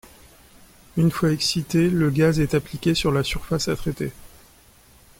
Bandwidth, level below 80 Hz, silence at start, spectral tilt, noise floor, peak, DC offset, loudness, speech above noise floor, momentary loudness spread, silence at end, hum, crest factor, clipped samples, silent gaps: 16.5 kHz; -42 dBFS; 0.95 s; -5.5 dB/octave; -52 dBFS; -6 dBFS; under 0.1%; -22 LUFS; 31 dB; 9 LU; 0.9 s; none; 16 dB; under 0.1%; none